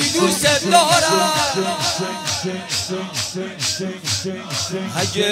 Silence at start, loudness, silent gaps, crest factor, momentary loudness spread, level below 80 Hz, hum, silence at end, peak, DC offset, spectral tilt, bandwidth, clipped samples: 0 s; -18 LUFS; none; 20 dB; 10 LU; -52 dBFS; none; 0 s; 0 dBFS; under 0.1%; -2.5 dB/octave; 16 kHz; under 0.1%